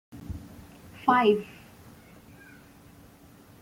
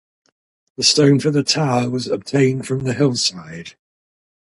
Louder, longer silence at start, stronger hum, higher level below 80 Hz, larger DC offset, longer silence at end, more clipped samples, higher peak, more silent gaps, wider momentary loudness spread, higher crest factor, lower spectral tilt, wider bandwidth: second, -24 LUFS vs -17 LUFS; second, 0.15 s vs 0.8 s; neither; about the same, -56 dBFS vs -58 dBFS; neither; first, 2.15 s vs 0.8 s; neither; second, -8 dBFS vs -2 dBFS; neither; first, 28 LU vs 10 LU; first, 24 dB vs 18 dB; first, -6 dB/octave vs -4.5 dB/octave; first, 17 kHz vs 11.5 kHz